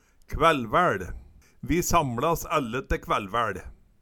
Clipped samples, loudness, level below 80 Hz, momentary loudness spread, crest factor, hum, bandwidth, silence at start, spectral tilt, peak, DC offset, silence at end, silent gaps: under 0.1%; -25 LUFS; -40 dBFS; 15 LU; 22 dB; none; 19 kHz; 0.3 s; -4.5 dB/octave; -6 dBFS; under 0.1%; 0.3 s; none